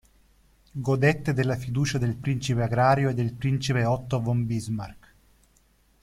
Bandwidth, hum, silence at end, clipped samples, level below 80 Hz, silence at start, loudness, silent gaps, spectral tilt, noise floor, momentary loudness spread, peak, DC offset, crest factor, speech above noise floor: 13 kHz; none; 1.05 s; under 0.1%; -52 dBFS; 0.75 s; -25 LUFS; none; -6.5 dB/octave; -62 dBFS; 10 LU; -6 dBFS; under 0.1%; 20 dB; 38 dB